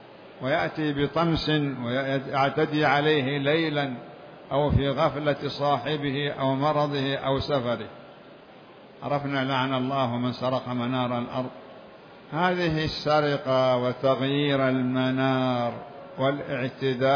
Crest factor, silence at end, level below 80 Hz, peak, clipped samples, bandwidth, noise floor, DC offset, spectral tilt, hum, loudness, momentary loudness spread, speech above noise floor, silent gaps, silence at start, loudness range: 18 dB; 0 s; -50 dBFS; -8 dBFS; under 0.1%; 5.4 kHz; -48 dBFS; under 0.1%; -7.5 dB/octave; none; -26 LUFS; 9 LU; 23 dB; none; 0 s; 4 LU